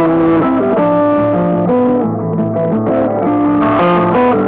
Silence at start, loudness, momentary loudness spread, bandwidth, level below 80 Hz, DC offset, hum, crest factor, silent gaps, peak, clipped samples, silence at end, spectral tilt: 0 s; -12 LUFS; 4 LU; 4 kHz; -42 dBFS; under 0.1%; none; 4 dB; none; -6 dBFS; under 0.1%; 0 s; -12 dB/octave